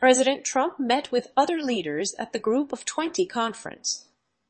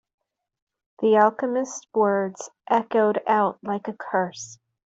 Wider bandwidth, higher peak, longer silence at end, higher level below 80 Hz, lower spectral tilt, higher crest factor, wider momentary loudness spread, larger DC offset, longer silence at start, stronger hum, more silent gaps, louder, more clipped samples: about the same, 8.8 kHz vs 8 kHz; about the same, -4 dBFS vs -6 dBFS; about the same, 0.5 s vs 0.4 s; about the same, -72 dBFS vs -74 dBFS; second, -2.5 dB/octave vs -5 dB/octave; about the same, 22 dB vs 18 dB; second, 6 LU vs 12 LU; neither; second, 0 s vs 1 s; neither; neither; second, -26 LUFS vs -23 LUFS; neither